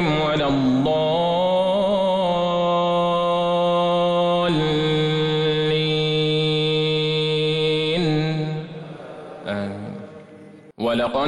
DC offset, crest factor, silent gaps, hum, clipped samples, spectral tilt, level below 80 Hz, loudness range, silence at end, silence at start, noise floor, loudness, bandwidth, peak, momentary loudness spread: under 0.1%; 10 dB; none; none; under 0.1%; -6.5 dB/octave; -48 dBFS; 5 LU; 0 s; 0 s; -44 dBFS; -20 LUFS; 10 kHz; -10 dBFS; 11 LU